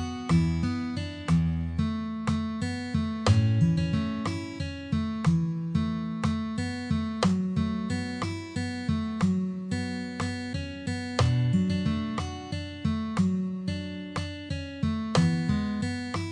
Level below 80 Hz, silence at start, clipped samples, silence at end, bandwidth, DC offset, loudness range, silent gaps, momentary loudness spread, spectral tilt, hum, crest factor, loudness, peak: -44 dBFS; 0 s; under 0.1%; 0 s; 10 kHz; under 0.1%; 3 LU; none; 9 LU; -6.5 dB/octave; none; 18 dB; -29 LUFS; -10 dBFS